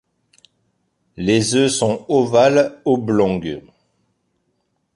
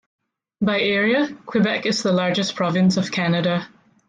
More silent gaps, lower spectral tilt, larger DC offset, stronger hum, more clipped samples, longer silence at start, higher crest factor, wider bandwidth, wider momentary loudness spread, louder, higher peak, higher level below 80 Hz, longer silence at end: neither; about the same, -5 dB/octave vs -5.5 dB/octave; neither; neither; neither; first, 1.2 s vs 0.6 s; about the same, 18 dB vs 14 dB; first, 11.5 kHz vs 9.2 kHz; first, 11 LU vs 5 LU; first, -17 LUFS vs -20 LUFS; first, -2 dBFS vs -8 dBFS; first, -52 dBFS vs -62 dBFS; first, 1.35 s vs 0.4 s